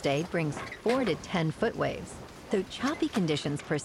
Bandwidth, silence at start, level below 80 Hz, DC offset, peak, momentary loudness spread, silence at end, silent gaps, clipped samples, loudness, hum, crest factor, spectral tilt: 15.5 kHz; 0 s; -56 dBFS; under 0.1%; -14 dBFS; 5 LU; 0 s; none; under 0.1%; -31 LUFS; none; 18 dB; -5.5 dB/octave